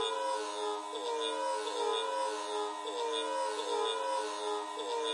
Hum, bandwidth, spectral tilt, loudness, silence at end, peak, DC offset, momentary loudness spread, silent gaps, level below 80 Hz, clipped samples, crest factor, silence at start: none; 11.5 kHz; 0.5 dB/octave; -35 LUFS; 0 s; -22 dBFS; under 0.1%; 4 LU; none; under -90 dBFS; under 0.1%; 14 dB; 0 s